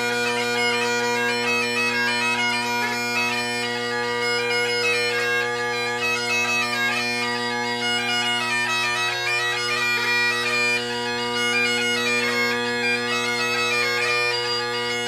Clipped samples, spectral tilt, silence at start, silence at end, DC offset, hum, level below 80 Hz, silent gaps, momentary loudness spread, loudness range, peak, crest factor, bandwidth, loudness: under 0.1%; -2 dB/octave; 0 s; 0 s; under 0.1%; none; -62 dBFS; none; 4 LU; 1 LU; -10 dBFS; 12 dB; 15.5 kHz; -21 LUFS